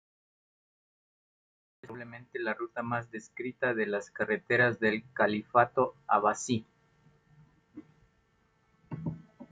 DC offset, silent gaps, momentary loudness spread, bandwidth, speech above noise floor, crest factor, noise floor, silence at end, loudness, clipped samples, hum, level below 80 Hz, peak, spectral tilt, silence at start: under 0.1%; none; 18 LU; 9.4 kHz; 40 dB; 22 dB; -70 dBFS; 0.05 s; -30 LUFS; under 0.1%; none; -72 dBFS; -10 dBFS; -5 dB/octave; 1.85 s